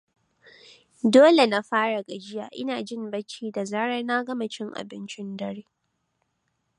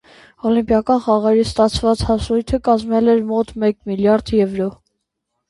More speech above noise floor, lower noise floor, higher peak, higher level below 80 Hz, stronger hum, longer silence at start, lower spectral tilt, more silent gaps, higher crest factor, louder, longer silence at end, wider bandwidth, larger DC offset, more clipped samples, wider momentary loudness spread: second, 51 dB vs 59 dB; about the same, -75 dBFS vs -75 dBFS; about the same, -4 dBFS vs -2 dBFS; second, -76 dBFS vs -36 dBFS; neither; first, 1.05 s vs 0.45 s; second, -4.5 dB/octave vs -6.5 dB/octave; neither; first, 22 dB vs 16 dB; second, -24 LUFS vs -17 LUFS; first, 1.15 s vs 0.75 s; about the same, 11 kHz vs 11.5 kHz; neither; neither; first, 19 LU vs 5 LU